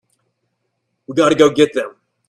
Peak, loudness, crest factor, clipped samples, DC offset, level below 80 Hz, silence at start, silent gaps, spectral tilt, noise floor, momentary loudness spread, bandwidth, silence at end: 0 dBFS; -15 LUFS; 18 dB; under 0.1%; under 0.1%; -58 dBFS; 1.1 s; none; -5 dB/octave; -71 dBFS; 12 LU; 12 kHz; 0.4 s